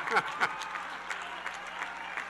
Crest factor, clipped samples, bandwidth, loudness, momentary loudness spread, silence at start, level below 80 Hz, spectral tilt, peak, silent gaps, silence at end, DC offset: 22 dB; under 0.1%; 12 kHz; -34 LUFS; 8 LU; 0 s; -70 dBFS; -2 dB/octave; -14 dBFS; none; 0 s; under 0.1%